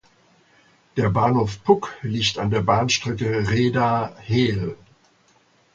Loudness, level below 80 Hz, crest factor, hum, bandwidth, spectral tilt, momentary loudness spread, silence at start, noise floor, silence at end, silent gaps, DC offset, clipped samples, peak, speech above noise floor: -21 LUFS; -48 dBFS; 20 dB; none; 7.8 kHz; -5.5 dB/octave; 6 LU; 0.95 s; -59 dBFS; 1 s; none; under 0.1%; under 0.1%; -2 dBFS; 38 dB